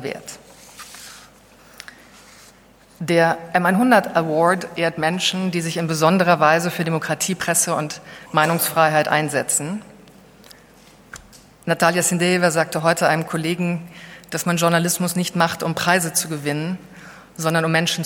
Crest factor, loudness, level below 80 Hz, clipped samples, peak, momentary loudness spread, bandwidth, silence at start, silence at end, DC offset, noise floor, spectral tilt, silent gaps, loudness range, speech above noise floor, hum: 20 dB; -19 LUFS; -60 dBFS; under 0.1%; 0 dBFS; 21 LU; 18 kHz; 0 s; 0 s; under 0.1%; -50 dBFS; -4 dB/octave; none; 4 LU; 31 dB; none